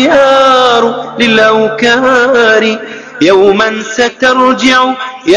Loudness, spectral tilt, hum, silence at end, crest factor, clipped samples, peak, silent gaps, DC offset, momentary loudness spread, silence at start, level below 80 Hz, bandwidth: -8 LUFS; -3.5 dB/octave; none; 0 s; 8 dB; 2%; 0 dBFS; none; under 0.1%; 7 LU; 0 s; -46 dBFS; 11 kHz